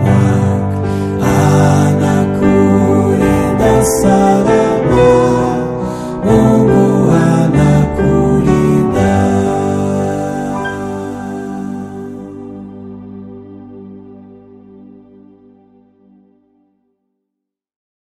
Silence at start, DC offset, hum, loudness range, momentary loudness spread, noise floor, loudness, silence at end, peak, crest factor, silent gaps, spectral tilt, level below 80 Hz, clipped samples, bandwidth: 0 s; under 0.1%; none; 17 LU; 19 LU; -78 dBFS; -12 LUFS; 4 s; 0 dBFS; 12 dB; none; -7.5 dB/octave; -32 dBFS; under 0.1%; 14.5 kHz